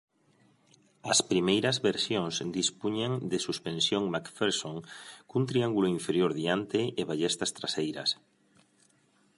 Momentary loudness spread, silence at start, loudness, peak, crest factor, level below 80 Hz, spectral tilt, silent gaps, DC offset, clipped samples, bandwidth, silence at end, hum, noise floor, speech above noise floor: 7 LU; 1.05 s; -29 LUFS; -12 dBFS; 20 dB; -68 dBFS; -4 dB/octave; none; under 0.1%; under 0.1%; 11.5 kHz; 1.25 s; none; -67 dBFS; 37 dB